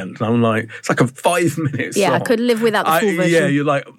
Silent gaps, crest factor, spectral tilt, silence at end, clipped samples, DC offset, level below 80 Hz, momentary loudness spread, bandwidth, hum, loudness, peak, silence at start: none; 14 dB; -5.5 dB/octave; 0.1 s; under 0.1%; under 0.1%; -66 dBFS; 5 LU; 17 kHz; none; -17 LUFS; -2 dBFS; 0 s